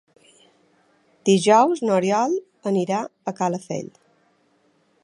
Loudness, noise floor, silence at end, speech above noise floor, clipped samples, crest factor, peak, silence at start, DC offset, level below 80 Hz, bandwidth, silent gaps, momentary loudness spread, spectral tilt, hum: -21 LUFS; -63 dBFS; 1.15 s; 43 dB; under 0.1%; 20 dB; -2 dBFS; 1.25 s; under 0.1%; -76 dBFS; 11.5 kHz; none; 15 LU; -5.5 dB/octave; none